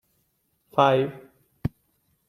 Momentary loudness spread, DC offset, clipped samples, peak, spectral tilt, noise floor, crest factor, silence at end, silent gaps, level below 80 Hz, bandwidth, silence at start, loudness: 14 LU; under 0.1%; under 0.1%; -4 dBFS; -7 dB/octave; -71 dBFS; 24 dB; 0.6 s; none; -52 dBFS; 15 kHz; 0.75 s; -25 LUFS